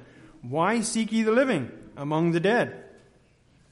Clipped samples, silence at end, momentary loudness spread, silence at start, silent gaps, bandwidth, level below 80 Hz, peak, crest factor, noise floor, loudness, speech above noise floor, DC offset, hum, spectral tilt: under 0.1%; 0.85 s; 15 LU; 0 s; none; 11.5 kHz; -64 dBFS; -10 dBFS; 16 dB; -60 dBFS; -25 LUFS; 36 dB; under 0.1%; none; -5 dB/octave